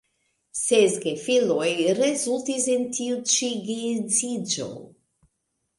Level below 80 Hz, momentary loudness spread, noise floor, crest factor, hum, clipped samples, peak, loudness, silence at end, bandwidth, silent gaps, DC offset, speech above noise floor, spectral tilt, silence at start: -70 dBFS; 8 LU; -77 dBFS; 18 dB; none; under 0.1%; -6 dBFS; -23 LUFS; 0.95 s; 11.5 kHz; none; under 0.1%; 53 dB; -2.5 dB/octave; 0.55 s